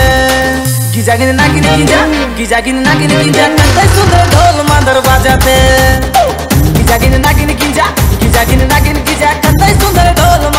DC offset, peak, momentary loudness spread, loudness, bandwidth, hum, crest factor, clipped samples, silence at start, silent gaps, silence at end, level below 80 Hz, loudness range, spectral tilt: under 0.1%; 0 dBFS; 4 LU; -8 LUFS; 16.5 kHz; none; 8 dB; 0.1%; 0 s; none; 0 s; -16 dBFS; 2 LU; -4.5 dB/octave